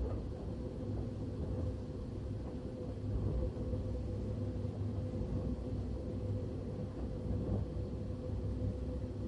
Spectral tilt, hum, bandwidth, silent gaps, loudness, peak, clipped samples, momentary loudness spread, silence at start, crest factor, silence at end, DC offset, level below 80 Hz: -9.5 dB/octave; none; 9.4 kHz; none; -41 LUFS; -24 dBFS; under 0.1%; 5 LU; 0 s; 14 dB; 0 s; under 0.1%; -44 dBFS